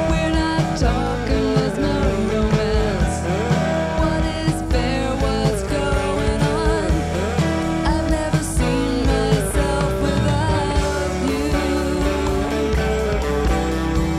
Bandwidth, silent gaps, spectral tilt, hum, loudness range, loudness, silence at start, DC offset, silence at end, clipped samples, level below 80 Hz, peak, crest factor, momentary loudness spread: 14.5 kHz; none; -6 dB/octave; none; 1 LU; -20 LUFS; 0 s; under 0.1%; 0 s; under 0.1%; -24 dBFS; -4 dBFS; 14 dB; 2 LU